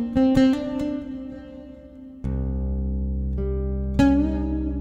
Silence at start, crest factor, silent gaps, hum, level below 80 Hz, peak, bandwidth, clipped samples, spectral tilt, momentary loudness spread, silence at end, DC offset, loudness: 0 s; 18 dB; none; none; -30 dBFS; -6 dBFS; 8.2 kHz; under 0.1%; -8 dB/octave; 21 LU; 0 s; under 0.1%; -24 LUFS